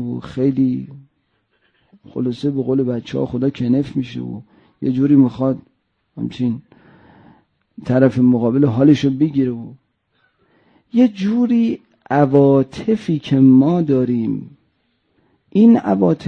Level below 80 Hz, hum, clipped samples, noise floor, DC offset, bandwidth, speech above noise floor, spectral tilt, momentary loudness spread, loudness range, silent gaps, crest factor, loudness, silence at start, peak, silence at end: -54 dBFS; none; under 0.1%; -66 dBFS; under 0.1%; 6.8 kHz; 50 dB; -9 dB/octave; 16 LU; 6 LU; none; 16 dB; -16 LUFS; 0 s; -2 dBFS; 0 s